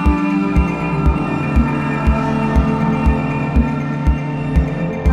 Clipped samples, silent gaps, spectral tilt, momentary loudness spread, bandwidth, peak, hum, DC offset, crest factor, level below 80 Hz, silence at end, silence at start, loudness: under 0.1%; none; -8.5 dB/octave; 3 LU; 8.6 kHz; -2 dBFS; none; under 0.1%; 14 dB; -20 dBFS; 0 s; 0 s; -17 LUFS